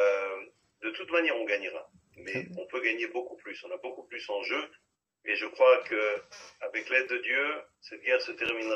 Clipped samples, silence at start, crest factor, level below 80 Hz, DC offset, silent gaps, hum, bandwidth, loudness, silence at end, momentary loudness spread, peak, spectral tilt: under 0.1%; 0 s; 22 dB; -78 dBFS; under 0.1%; none; none; 8 kHz; -30 LUFS; 0 s; 16 LU; -10 dBFS; -3.5 dB/octave